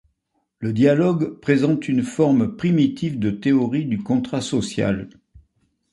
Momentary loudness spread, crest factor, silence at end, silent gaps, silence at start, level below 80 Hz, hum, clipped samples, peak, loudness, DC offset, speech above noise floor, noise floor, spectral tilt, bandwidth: 6 LU; 16 dB; 0.85 s; none; 0.6 s; -52 dBFS; none; under 0.1%; -4 dBFS; -20 LUFS; under 0.1%; 53 dB; -72 dBFS; -7 dB/octave; 11.5 kHz